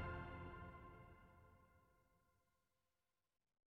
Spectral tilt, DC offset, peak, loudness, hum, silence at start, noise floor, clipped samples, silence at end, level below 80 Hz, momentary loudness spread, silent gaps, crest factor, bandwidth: -6 dB/octave; under 0.1%; -40 dBFS; -56 LUFS; none; 0 s; under -90 dBFS; under 0.1%; 1.5 s; -66 dBFS; 15 LU; none; 18 dB; 5.6 kHz